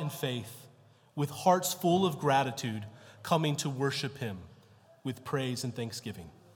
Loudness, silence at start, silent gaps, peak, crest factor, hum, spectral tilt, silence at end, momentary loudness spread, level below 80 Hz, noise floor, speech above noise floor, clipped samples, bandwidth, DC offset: -32 LUFS; 0 s; none; -12 dBFS; 20 dB; none; -5 dB/octave; 0.25 s; 18 LU; -74 dBFS; -60 dBFS; 29 dB; under 0.1%; 18 kHz; under 0.1%